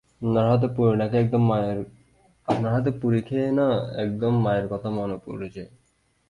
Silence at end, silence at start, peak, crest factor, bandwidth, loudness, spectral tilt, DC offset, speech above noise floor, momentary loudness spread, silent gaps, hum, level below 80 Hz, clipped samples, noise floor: 0.65 s; 0.2 s; -8 dBFS; 16 dB; 9.4 kHz; -24 LUFS; -9.5 dB/octave; under 0.1%; 21 dB; 14 LU; none; none; -54 dBFS; under 0.1%; -44 dBFS